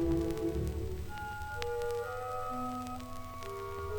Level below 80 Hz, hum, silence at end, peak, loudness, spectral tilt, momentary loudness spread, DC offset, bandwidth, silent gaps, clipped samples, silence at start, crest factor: -44 dBFS; none; 0 s; -14 dBFS; -38 LUFS; -6.5 dB/octave; 8 LU; under 0.1%; over 20 kHz; none; under 0.1%; 0 s; 22 dB